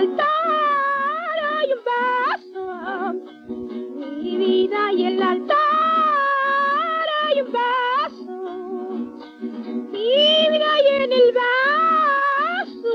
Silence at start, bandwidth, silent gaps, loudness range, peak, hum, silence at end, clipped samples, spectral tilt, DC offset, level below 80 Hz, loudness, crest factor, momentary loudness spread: 0 s; 7 kHz; none; 7 LU; -6 dBFS; none; 0 s; under 0.1%; -4 dB/octave; under 0.1%; -68 dBFS; -19 LUFS; 14 dB; 15 LU